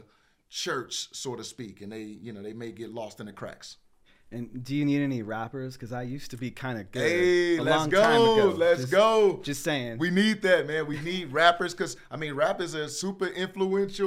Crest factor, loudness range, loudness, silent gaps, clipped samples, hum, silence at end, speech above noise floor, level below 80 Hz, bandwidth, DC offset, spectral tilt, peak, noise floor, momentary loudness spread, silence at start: 20 dB; 14 LU; -26 LUFS; none; under 0.1%; none; 0 s; 36 dB; -58 dBFS; 16 kHz; under 0.1%; -4.5 dB/octave; -6 dBFS; -63 dBFS; 19 LU; 0.5 s